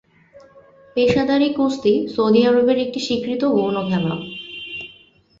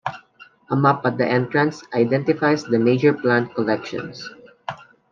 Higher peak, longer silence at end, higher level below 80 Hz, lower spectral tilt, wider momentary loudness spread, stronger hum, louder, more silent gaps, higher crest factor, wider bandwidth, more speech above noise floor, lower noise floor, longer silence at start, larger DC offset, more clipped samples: about the same, -4 dBFS vs -2 dBFS; first, 0.55 s vs 0.35 s; first, -54 dBFS vs -66 dBFS; about the same, -6.5 dB/octave vs -7 dB/octave; second, 15 LU vs 18 LU; neither; about the same, -19 LUFS vs -20 LUFS; neither; about the same, 16 dB vs 18 dB; about the same, 7.8 kHz vs 7.4 kHz; about the same, 33 dB vs 30 dB; about the same, -51 dBFS vs -50 dBFS; first, 0.35 s vs 0.05 s; neither; neither